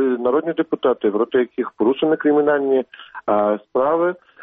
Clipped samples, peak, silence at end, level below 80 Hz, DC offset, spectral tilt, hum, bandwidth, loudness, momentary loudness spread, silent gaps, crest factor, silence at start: under 0.1%; -4 dBFS; 0 s; -64 dBFS; under 0.1%; -4.5 dB/octave; none; 3.9 kHz; -19 LUFS; 6 LU; none; 14 dB; 0 s